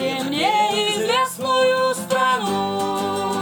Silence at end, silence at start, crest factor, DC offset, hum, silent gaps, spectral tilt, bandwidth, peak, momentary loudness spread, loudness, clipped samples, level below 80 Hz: 0 s; 0 s; 12 dB; under 0.1%; none; none; -3 dB/octave; 19 kHz; -8 dBFS; 5 LU; -20 LUFS; under 0.1%; -66 dBFS